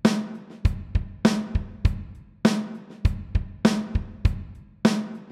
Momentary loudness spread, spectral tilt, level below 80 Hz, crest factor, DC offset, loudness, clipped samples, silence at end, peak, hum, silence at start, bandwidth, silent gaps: 13 LU; -6.5 dB/octave; -30 dBFS; 22 dB; under 0.1%; -26 LUFS; under 0.1%; 0 s; -2 dBFS; none; 0.05 s; 13.5 kHz; none